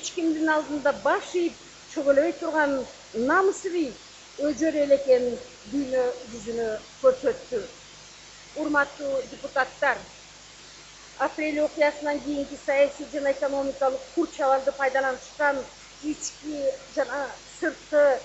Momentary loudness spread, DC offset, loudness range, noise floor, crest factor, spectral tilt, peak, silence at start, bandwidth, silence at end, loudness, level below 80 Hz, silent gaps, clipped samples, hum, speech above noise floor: 19 LU; under 0.1%; 4 LU; -47 dBFS; 18 dB; -3.5 dB/octave; -8 dBFS; 0 s; 8.2 kHz; 0 s; -26 LUFS; -60 dBFS; none; under 0.1%; 50 Hz at -60 dBFS; 22 dB